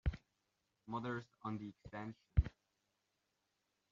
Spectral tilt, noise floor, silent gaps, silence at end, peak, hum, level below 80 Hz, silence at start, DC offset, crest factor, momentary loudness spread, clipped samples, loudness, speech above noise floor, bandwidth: -7 dB/octave; -86 dBFS; none; 1.45 s; -18 dBFS; none; -48 dBFS; 0.05 s; under 0.1%; 26 dB; 12 LU; under 0.1%; -44 LUFS; 39 dB; 7 kHz